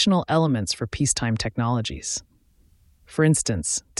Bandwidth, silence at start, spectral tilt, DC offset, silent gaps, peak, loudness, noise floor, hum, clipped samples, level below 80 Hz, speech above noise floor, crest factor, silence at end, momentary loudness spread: 12 kHz; 0 s; -4.5 dB/octave; under 0.1%; none; -6 dBFS; -23 LUFS; -59 dBFS; none; under 0.1%; -46 dBFS; 36 dB; 18 dB; 0.2 s; 9 LU